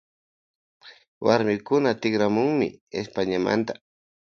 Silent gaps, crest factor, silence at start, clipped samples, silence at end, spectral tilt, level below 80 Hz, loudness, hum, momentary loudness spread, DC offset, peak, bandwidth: 1.08-1.21 s, 2.81-2.87 s; 22 dB; 0.85 s; under 0.1%; 0.6 s; -6 dB/octave; -62 dBFS; -24 LUFS; none; 10 LU; under 0.1%; -4 dBFS; 7 kHz